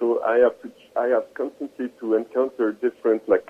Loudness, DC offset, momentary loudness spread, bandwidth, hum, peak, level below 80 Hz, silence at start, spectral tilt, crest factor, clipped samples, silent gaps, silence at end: -23 LUFS; under 0.1%; 11 LU; 5.6 kHz; none; -6 dBFS; -68 dBFS; 0 s; -7 dB/octave; 18 dB; under 0.1%; none; 0.1 s